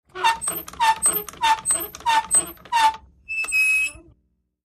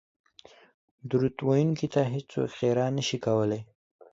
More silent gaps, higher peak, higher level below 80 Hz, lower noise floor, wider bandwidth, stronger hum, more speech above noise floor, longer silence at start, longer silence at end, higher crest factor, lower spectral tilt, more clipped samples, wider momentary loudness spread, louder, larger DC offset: neither; first, -6 dBFS vs -12 dBFS; first, -54 dBFS vs -64 dBFS; first, -68 dBFS vs -55 dBFS; first, 15.5 kHz vs 7.8 kHz; neither; first, 47 dB vs 29 dB; second, 0.15 s vs 1.05 s; first, 0.7 s vs 0.5 s; about the same, 16 dB vs 16 dB; second, 1 dB/octave vs -6.5 dB/octave; neither; first, 9 LU vs 6 LU; first, -20 LUFS vs -28 LUFS; neither